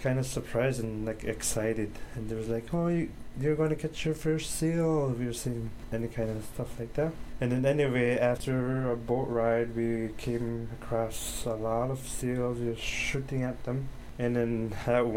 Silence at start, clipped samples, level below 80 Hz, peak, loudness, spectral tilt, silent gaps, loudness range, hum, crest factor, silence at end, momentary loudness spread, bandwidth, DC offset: 0 s; under 0.1%; -46 dBFS; -14 dBFS; -31 LUFS; -6 dB/octave; none; 3 LU; none; 16 dB; 0 s; 8 LU; 16.5 kHz; under 0.1%